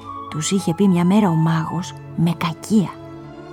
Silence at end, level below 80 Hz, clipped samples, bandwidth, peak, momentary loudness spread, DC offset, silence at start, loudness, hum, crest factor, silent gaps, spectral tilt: 0 s; -56 dBFS; under 0.1%; 15.5 kHz; -6 dBFS; 14 LU; under 0.1%; 0 s; -19 LUFS; none; 14 dB; none; -6 dB/octave